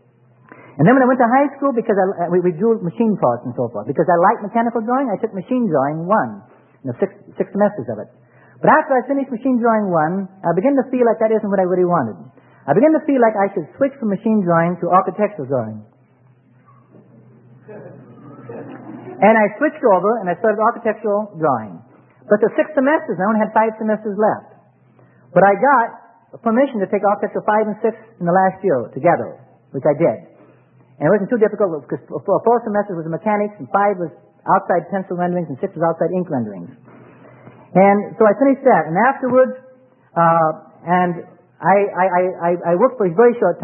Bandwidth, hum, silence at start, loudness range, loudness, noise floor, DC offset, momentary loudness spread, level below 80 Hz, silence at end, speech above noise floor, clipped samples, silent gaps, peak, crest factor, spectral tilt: 3.3 kHz; none; 0.75 s; 4 LU; -17 LUFS; -52 dBFS; under 0.1%; 12 LU; -68 dBFS; 0 s; 36 dB; under 0.1%; none; 0 dBFS; 18 dB; -12.5 dB/octave